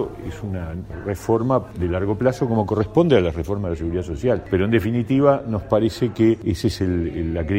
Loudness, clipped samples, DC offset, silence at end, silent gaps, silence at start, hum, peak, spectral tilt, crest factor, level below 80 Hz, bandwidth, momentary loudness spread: -21 LUFS; under 0.1%; under 0.1%; 0 s; none; 0 s; none; -2 dBFS; -7.5 dB/octave; 18 dB; -38 dBFS; 16 kHz; 11 LU